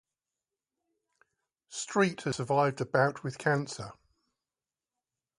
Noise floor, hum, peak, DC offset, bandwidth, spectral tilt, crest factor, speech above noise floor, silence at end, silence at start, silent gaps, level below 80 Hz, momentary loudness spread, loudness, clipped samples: under -90 dBFS; none; -12 dBFS; under 0.1%; 11.5 kHz; -5 dB/octave; 22 dB; over 60 dB; 1.45 s; 1.7 s; none; -70 dBFS; 13 LU; -30 LUFS; under 0.1%